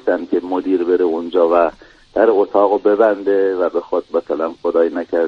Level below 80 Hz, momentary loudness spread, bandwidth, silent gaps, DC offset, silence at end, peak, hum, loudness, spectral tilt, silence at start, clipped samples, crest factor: -54 dBFS; 6 LU; 6.2 kHz; none; under 0.1%; 0 s; 0 dBFS; none; -16 LUFS; -7 dB/octave; 0.05 s; under 0.1%; 16 dB